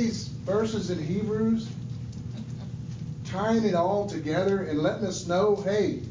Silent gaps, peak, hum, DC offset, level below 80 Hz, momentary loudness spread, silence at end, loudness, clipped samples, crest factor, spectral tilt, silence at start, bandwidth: none; -12 dBFS; none; under 0.1%; -50 dBFS; 13 LU; 0 s; -28 LUFS; under 0.1%; 16 dB; -6.5 dB/octave; 0 s; 7.6 kHz